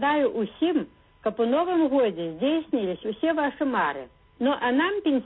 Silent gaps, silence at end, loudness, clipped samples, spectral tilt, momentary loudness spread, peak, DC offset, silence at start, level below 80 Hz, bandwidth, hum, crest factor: none; 0 s; -25 LUFS; under 0.1%; -9.5 dB/octave; 7 LU; -12 dBFS; under 0.1%; 0 s; -62 dBFS; 4.1 kHz; none; 12 dB